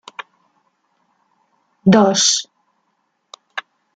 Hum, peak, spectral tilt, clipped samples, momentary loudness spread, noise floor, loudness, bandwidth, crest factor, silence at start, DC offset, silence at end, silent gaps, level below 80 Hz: none; -2 dBFS; -3.5 dB/octave; under 0.1%; 23 LU; -68 dBFS; -14 LUFS; 9.4 kHz; 20 dB; 1.85 s; under 0.1%; 0.35 s; none; -62 dBFS